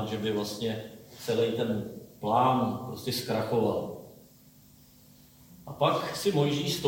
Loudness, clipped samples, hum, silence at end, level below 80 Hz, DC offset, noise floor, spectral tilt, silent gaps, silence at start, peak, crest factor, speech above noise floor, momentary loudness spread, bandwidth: -29 LUFS; under 0.1%; none; 0 s; -64 dBFS; under 0.1%; -56 dBFS; -5.5 dB/octave; none; 0 s; -12 dBFS; 18 dB; 28 dB; 15 LU; 17 kHz